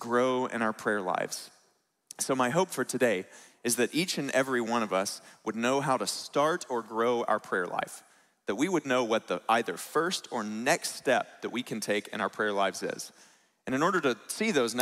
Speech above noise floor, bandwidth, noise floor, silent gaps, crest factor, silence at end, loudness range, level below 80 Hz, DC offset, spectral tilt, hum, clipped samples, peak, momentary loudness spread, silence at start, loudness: 41 dB; 16 kHz; -71 dBFS; none; 20 dB; 0 s; 2 LU; -78 dBFS; under 0.1%; -3.5 dB/octave; none; under 0.1%; -10 dBFS; 9 LU; 0 s; -30 LUFS